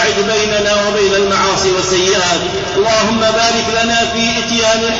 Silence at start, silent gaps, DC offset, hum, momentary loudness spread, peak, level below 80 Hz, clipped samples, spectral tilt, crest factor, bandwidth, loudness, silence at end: 0 s; none; under 0.1%; none; 2 LU; -2 dBFS; -38 dBFS; under 0.1%; -2.5 dB/octave; 10 dB; 7.8 kHz; -12 LUFS; 0 s